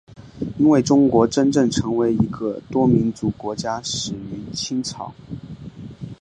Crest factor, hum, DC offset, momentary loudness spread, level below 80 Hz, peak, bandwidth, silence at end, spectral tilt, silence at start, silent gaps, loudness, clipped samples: 18 dB; none; under 0.1%; 20 LU; -46 dBFS; -2 dBFS; 10 kHz; 0.05 s; -6 dB/octave; 0.2 s; none; -20 LUFS; under 0.1%